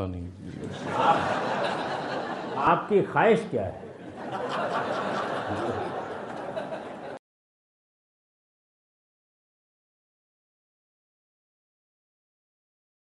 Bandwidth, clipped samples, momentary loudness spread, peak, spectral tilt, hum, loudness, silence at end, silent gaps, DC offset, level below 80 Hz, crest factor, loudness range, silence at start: 11.5 kHz; under 0.1%; 16 LU; -8 dBFS; -6 dB/octave; none; -28 LUFS; 5.9 s; none; under 0.1%; -66 dBFS; 24 dB; 15 LU; 0 s